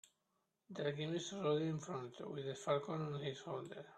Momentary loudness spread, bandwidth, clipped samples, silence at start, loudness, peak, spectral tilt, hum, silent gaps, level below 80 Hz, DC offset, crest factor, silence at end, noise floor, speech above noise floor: 9 LU; 9.8 kHz; under 0.1%; 0.7 s; -42 LUFS; -24 dBFS; -5.5 dB/octave; none; none; -82 dBFS; under 0.1%; 20 dB; 0 s; -85 dBFS; 43 dB